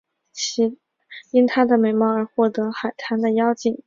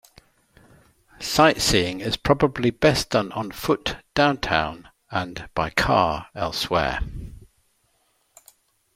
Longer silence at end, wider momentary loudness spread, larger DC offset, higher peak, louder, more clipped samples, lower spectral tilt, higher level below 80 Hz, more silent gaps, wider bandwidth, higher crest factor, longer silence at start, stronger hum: second, 0.1 s vs 1.6 s; second, 9 LU vs 12 LU; neither; about the same, -4 dBFS vs -2 dBFS; about the same, -20 LUFS vs -22 LUFS; neither; about the same, -4.5 dB/octave vs -4 dB/octave; second, -68 dBFS vs -42 dBFS; neither; second, 7.6 kHz vs 16.5 kHz; about the same, 18 dB vs 22 dB; second, 0.35 s vs 1.2 s; neither